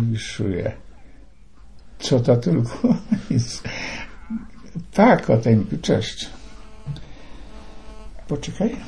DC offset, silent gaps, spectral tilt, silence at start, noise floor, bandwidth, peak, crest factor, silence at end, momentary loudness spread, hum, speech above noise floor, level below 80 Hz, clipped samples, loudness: 1%; none; -6.5 dB/octave; 0 s; -48 dBFS; 10.5 kHz; -2 dBFS; 20 dB; 0 s; 22 LU; none; 28 dB; -42 dBFS; under 0.1%; -21 LUFS